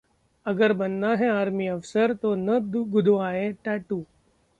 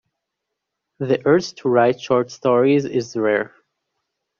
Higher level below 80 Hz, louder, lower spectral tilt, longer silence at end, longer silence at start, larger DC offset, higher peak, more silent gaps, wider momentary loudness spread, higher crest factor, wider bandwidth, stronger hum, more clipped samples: about the same, -64 dBFS vs -62 dBFS; second, -25 LUFS vs -19 LUFS; first, -7.5 dB/octave vs -5.5 dB/octave; second, 0.55 s vs 0.95 s; second, 0.45 s vs 1 s; neither; second, -8 dBFS vs -4 dBFS; neither; about the same, 8 LU vs 7 LU; about the same, 16 dB vs 18 dB; first, 9 kHz vs 7.4 kHz; neither; neither